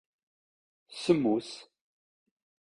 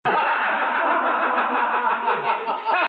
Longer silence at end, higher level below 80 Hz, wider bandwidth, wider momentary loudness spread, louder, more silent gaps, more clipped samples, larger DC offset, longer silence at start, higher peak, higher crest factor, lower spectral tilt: first, 1.1 s vs 0 s; first, -70 dBFS vs -78 dBFS; first, 11 kHz vs 5.2 kHz; first, 20 LU vs 2 LU; second, -29 LUFS vs -21 LUFS; neither; neither; neither; first, 0.9 s vs 0.05 s; about the same, -10 dBFS vs -10 dBFS; first, 24 dB vs 12 dB; about the same, -6 dB/octave vs -6 dB/octave